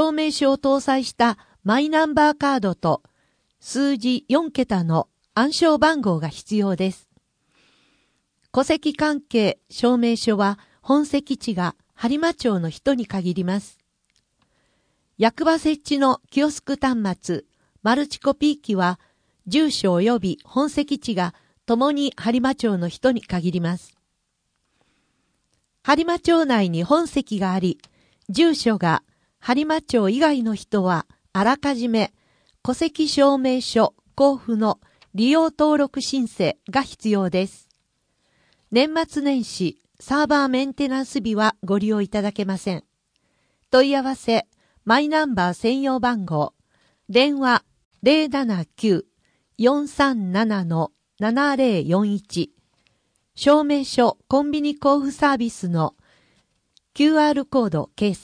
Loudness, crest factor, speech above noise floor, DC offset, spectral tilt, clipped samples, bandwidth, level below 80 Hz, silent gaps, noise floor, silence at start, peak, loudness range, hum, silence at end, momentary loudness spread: -21 LUFS; 18 dB; 53 dB; under 0.1%; -5.5 dB/octave; under 0.1%; 10.5 kHz; -56 dBFS; 47.85-47.91 s; -73 dBFS; 0 s; -4 dBFS; 4 LU; none; 0.05 s; 8 LU